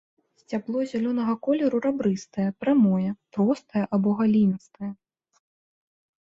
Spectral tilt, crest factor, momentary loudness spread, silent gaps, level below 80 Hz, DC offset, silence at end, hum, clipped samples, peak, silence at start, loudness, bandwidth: -8 dB/octave; 14 dB; 12 LU; none; -66 dBFS; under 0.1%; 1.35 s; none; under 0.1%; -10 dBFS; 0.5 s; -25 LUFS; 7.6 kHz